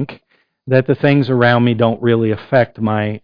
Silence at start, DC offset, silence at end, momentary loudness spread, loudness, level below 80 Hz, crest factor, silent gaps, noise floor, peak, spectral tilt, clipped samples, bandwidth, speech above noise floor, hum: 0 s; under 0.1%; 0.05 s; 5 LU; -15 LUFS; -52 dBFS; 14 dB; none; -59 dBFS; 0 dBFS; -10 dB/octave; under 0.1%; 5.2 kHz; 45 dB; none